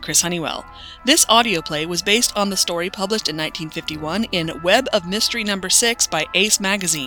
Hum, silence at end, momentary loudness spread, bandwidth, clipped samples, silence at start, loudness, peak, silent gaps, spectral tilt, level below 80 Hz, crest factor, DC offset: none; 0 s; 10 LU; over 20 kHz; under 0.1%; 0 s; -18 LUFS; 0 dBFS; none; -1.5 dB/octave; -48 dBFS; 20 dB; under 0.1%